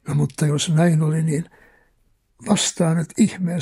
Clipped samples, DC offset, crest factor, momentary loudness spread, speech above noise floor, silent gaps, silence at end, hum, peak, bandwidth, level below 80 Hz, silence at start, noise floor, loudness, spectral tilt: under 0.1%; under 0.1%; 16 dB; 8 LU; 43 dB; none; 0 s; none; -4 dBFS; 12.5 kHz; -56 dBFS; 0.05 s; -62 dBFS; -20 LUFS; -5.5 dB/octave